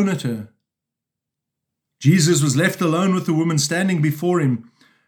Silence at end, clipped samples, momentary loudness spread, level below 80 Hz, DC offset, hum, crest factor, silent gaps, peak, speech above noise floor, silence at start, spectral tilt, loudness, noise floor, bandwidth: 0.45 s; under 0.1%; 9 LU; -74 dBFS; under 0.1%; none; 18 dB; none; -2 dBFS; 66 dB; 0 s; -5 dB/octave; -19 LUFS; -84 dBFS; over 20 kHz